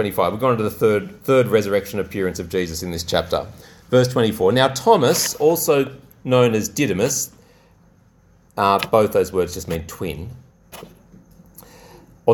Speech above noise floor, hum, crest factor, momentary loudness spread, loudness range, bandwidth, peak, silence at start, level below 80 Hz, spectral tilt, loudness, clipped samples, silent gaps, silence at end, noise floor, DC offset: 35 dB; none; 20 dB; 13 LU; 5 LU; 19 kHz; 0 dBFS; 0 s; -48 dBFS; -4.5 dB/octave; -19 LUFS; under 0.1%; none; 0 s; -54 dBFS; under 0.1%